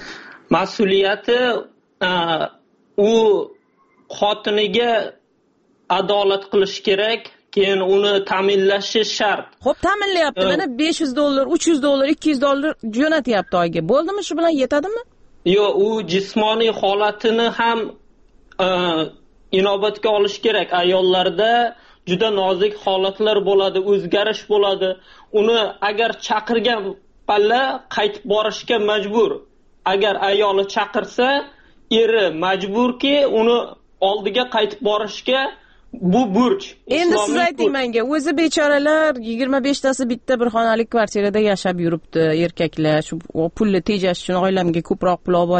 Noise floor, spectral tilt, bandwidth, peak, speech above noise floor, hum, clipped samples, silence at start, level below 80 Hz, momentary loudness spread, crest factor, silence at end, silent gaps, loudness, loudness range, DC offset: -61 dBFS; -4.5 dB/octave; 8.8 kHz; -2 dBFS; 43 dB; none; under 0.1%; 0 s; -52 dBFS; 6 LU; 16 dB; 0 s; none; -18 LUFS; 2 LU; under 0.1%